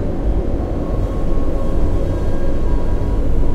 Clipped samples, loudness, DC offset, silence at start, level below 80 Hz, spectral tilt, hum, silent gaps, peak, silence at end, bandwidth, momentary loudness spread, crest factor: under 0.1%; -21 LUFS; under 0.1%; 0 s; -18 dBFS; -9 dB/octave; none; none; -4 dBFS; 0 s; 4.6 kHz; 1 LU; 10 dB